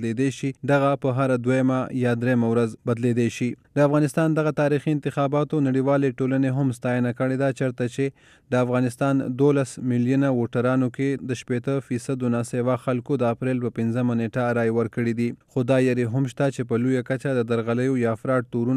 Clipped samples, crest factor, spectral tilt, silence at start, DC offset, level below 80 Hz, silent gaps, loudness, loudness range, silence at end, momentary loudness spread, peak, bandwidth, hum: under 0.1%; 14 dB; -7.5 dB/octave; 0 s; under 0.1%; -64 dBFS; none; -23 LUFS; 2 LU; 0 s; 5 LU; -8 dBFS; 12.5 kHz; none